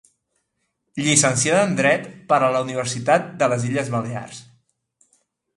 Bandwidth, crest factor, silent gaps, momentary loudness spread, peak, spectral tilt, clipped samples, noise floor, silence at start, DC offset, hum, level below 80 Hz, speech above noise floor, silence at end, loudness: 11.5 kHz; 20 dB; none; 15 LU; -2 dBFS; -3.5 dB/octave; under 0.1%; -74 dBFS; 0.95 s; under 0.1%; none; -62 dBFS; 54 dB; 1.15 s; -19 LUFS